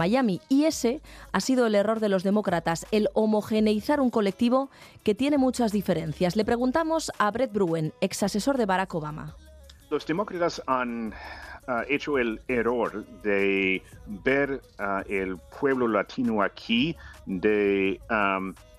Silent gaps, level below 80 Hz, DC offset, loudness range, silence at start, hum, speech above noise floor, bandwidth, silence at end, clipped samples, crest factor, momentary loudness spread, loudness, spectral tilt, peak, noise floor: none; -52 dBFS; under 0.1%; 4 LU; 0 s; none; 24 dB; 14.5 kHz; 0 s; under 0.1%; 20 dB; 9 LU; -26 LUFS; -5.5 dB/octave; -6 dBFS; -50 dBFS